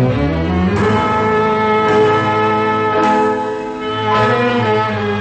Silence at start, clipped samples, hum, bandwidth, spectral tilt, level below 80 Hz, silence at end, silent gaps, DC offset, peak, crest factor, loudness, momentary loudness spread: 0 s; under 0.1%; none; 8.6 kHz; -7 dB/octave; -34 dBFS; 0 s; none; under 0.1%; -2 dBFS; 12 dB; -14 LUFS; 5 LU